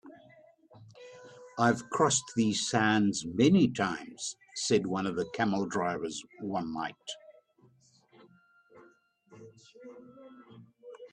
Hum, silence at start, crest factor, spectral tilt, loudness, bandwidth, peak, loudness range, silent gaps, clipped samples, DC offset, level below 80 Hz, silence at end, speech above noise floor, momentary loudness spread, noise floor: none; 0.05 s; 20 dB; -4.5 dB/octave; -30 LUFS; 10.5 kHz; -12 dBFS; 14 LU; none; under 0.1%; under 0.1%; -70 dBFS; 0.05 s; 35 dB; 25 LU; -65 dBFS